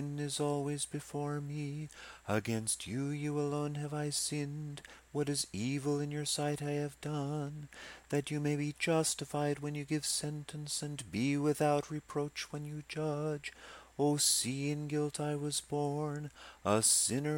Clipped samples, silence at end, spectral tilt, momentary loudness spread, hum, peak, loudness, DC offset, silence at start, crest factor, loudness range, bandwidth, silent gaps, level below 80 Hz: under 0.1%; 0 s; -4 dB/octave; 12 LU; none; -14 dBFS; -35 LUFS; under 0.1%; 0 s; 20 dB; 3 LU; 16.5 kHz; none; -66 dBFS